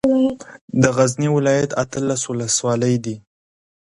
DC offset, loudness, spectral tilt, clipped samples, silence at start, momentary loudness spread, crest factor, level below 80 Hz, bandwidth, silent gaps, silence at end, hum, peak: under 0.1%; -19 LUFS; -5 dB/octave; under 0.1%; 0.05 s; 9 LU; 18 dB; -52 dBFS; 11.5 kHz; 0.61-0.68 s; 0.8 s; none; 0 dBFS